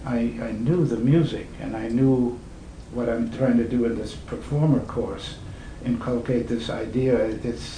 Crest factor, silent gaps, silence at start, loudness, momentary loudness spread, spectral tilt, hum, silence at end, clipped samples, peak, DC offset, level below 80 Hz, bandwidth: 16 dB; none; 0 s; -24 LUFS; 14 LU; -8 dB/octave; none; 0 s; under 0.1%; -8 dBFS; under 0.1%; -42 dBFS; 10 kHz